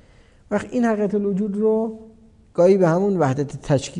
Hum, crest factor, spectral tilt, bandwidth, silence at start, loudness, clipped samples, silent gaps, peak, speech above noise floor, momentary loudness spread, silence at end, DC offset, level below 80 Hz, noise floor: none; 16 dB; -7.5 dB/octave; 10.5 kHz; 0.5 s; -20 LUFS; under 0.1%; none; -6 dBFS; 32 dB; 11 LU; 0 s; under 0.1%; -52 dBFS; -51 dBFS